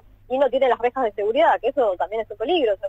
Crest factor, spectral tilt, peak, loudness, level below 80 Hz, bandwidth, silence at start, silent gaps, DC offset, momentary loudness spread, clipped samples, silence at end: 14 dB; -5.5 dB/octave; -6 dBFS; -21 LUFS; -54 dBFS; 7.8 kHz; 0.3 s; none; under 0.1%; 8 LU; under 0.1%; 0 s